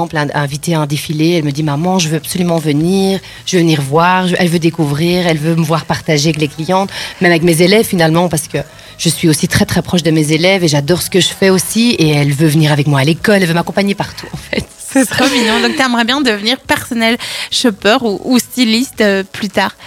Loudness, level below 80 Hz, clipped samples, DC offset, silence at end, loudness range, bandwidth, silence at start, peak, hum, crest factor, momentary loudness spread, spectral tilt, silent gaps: -12 LUFS; -42 dBFS; under 0.1%; under 0.1%; 0 s; 2 LU; 17.5 kHz; 0 s; 0 dBFS; none; 12 dB; 6 LU; -4.5 dB/octave; none